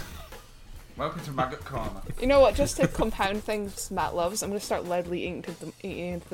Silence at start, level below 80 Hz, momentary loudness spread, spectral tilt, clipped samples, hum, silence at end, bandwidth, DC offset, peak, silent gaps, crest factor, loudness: 0 s; -40 dBFS; 17 LU; -4.5 dB/octave; under 0.1%; none; 0 s; 17 kHz; under 0.1%; -8 dBFS; none; 20 dB; -28 LUFS